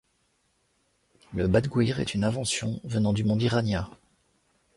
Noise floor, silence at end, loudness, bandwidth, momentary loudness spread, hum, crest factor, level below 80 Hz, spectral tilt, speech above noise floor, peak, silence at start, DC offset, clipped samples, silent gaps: -71 dBFS; 0.85 s; -27 LUFS; 11.5 kHz; 6 LU; none; 20 dB; -48 dBFS; -5.5 dB/octave; 45 dB; -8 dBFS; 1.3 s; under 0.1%; under 0.1%; none